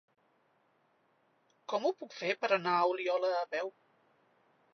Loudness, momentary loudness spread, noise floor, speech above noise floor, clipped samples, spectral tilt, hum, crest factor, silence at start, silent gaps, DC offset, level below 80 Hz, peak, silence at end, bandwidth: -33 LUFS; 9 LU; -73 dBFS; 40 dB; under 0.1%; -2 dB/octave; none; 22 dB; 1.7 s; none; under 0.1%; under -90 dBFS; -14 dBFS; 1.05 s; 6.4 kHz